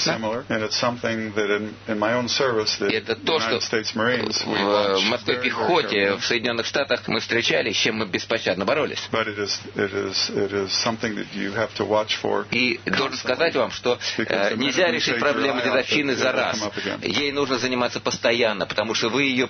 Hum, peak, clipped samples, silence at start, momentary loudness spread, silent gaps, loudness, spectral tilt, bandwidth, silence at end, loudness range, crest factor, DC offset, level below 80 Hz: none; -4 dBFS; under 0.1%; 0 s; 5 LU; none; -22 LUFS; -3.5 dB/octave; 6.6 kHz; 0 s; 2 LU; 18 dB; under 0.1%; -60 dBFS